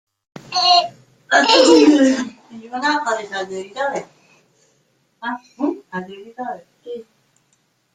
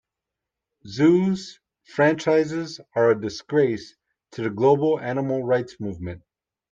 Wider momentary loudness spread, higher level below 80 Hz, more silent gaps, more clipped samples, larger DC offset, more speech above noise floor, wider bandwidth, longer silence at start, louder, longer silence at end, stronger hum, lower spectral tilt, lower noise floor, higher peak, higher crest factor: first, 21 LU vs 16 LU; about the same, -66 dBFS vs -62 dBFS; neither; neither; neither; second, 47 dB vs 64 dB; first, 9.4 kHz vs 7.8 kHz; second, 0.5 s vs 0.85 s; first, -16 LUFS vs -22 LUFS; first, 0.9 s vs 0.55 s; neither; second, -2.5 dB/octave vs -7 dB/octave; second, -64 dBFS vs -86 dBFS; first, 0 dBFS vs -6 dBFS; about the same, 18 dB vs 18 dB